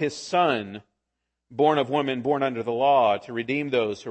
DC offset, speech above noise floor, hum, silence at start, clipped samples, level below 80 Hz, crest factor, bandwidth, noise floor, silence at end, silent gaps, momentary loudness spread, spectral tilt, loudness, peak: under 0.1%; 58 dB; none; 0 s; under 0.1%; -70 dBFS; 18 dB; 8.6 kHz; -82 dBFS; 0 s; none; 9 LU; -5.5 dB/octave; -24 LUFS; -8 dBFS